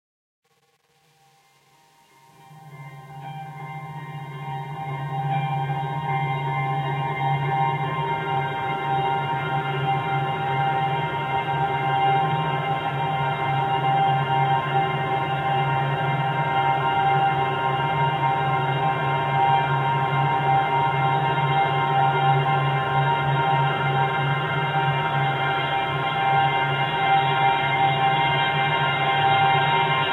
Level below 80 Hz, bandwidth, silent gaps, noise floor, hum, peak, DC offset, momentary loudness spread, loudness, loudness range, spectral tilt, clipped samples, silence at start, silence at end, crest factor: -58 dBFS; 5 kHz; none; -65 dBFS; none; -8 dBFS; under 0.1%; 6 LU; -22 LUFS; 8 LU; -7 dB/octave; under 0.1%; 2.5 s; 0 s; 14 dB